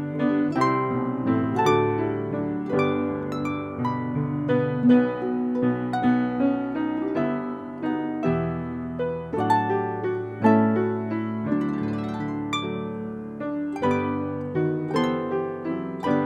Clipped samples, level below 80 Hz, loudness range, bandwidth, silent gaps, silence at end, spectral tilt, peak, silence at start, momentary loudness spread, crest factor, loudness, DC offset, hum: under 0.1%; -56 dBFS; 4 LU; 8.6 kHz; none; 0 s; -7.5 dB/octave; -6 dBFS; 0 s; 8 LU; 18 dB; -25 LUFS; under 0.1%; none